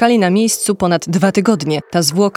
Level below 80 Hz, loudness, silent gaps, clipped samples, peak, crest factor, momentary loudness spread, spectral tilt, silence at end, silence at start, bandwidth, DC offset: -52 dBFS; -14 LUFS; none; under 0.1%; 0 dBFS; 14 dB; 4 LU; -4.5 dB/octave; 0.05 s; 0 s; 16.5 kHz; under 0.1%